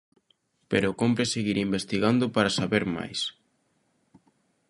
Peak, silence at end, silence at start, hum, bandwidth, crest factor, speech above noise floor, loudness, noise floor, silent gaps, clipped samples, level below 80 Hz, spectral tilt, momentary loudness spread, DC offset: -6 dBFS; 1.4 s; 0.7 s; none; 11.5 kHz; 22 dB; 45 dB; -26 LUFS; -71 dBFS; none; under 0.1%; -58 dBFS; -5 dB/octave; 7 LU; under 0.1%